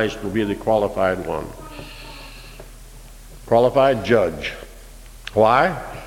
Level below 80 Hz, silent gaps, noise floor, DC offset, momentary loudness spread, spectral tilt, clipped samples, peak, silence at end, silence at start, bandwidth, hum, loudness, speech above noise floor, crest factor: -40 dBFS; none; -40 dBFS; under 0.1%; 22 LU; -6 dB/octave; under 0.1%; -2 dBFS; 0 s; 0 s; 16.5 kHz; none; -19 LUFS; 21 dB; 20 dB